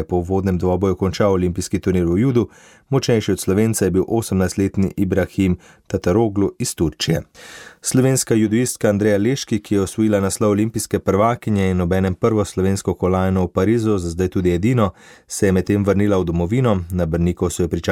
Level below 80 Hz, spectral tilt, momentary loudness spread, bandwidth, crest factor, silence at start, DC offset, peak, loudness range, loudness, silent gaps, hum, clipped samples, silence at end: -40 dBFS; -6 dB/octave; 5 LU; 16.5 kHz; 14 dB; 0 s; under 0.1%; -4 dBFS; 1 LU; -19 LUFS; none; none; under 0.1%; 0 s